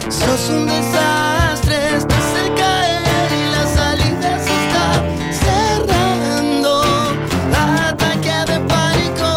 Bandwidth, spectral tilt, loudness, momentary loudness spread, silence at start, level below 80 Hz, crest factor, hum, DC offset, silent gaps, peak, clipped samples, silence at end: 16.5 kHz; -4.5 dB/octave; -15 LUFS; 2 LU; 0 s; -28 dBFS; 12 dB; none; under 0.1%; none; -2 dBFS; under 0.1%; 0 s